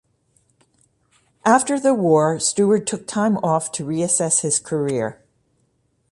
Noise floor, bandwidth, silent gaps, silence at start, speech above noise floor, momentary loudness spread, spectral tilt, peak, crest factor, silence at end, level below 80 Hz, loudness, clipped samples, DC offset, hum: -66 dBFS; 11.5 kHz; none; 1.45 s; 47 dB; 7 LU; -4.5 dB/octave; -2 dBFS; 18 dB; 1 s; -62 dBFS; -19 LUFS; under 0.1%; under 0.1%; none